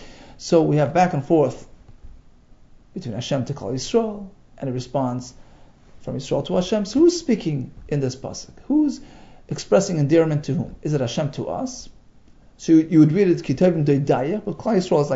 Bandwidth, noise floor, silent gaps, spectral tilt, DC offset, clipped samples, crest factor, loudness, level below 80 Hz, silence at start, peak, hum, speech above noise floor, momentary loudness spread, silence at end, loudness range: 8 kHz; -49 dBFS; none; -6.5 dB/octave; under 0.1%; under 0.1%; 18 dB; -21 LUFS; -48 dBFS; 0 s; -4 dBFS; none; 29 dB; 15 LU; 0 s; 7 LU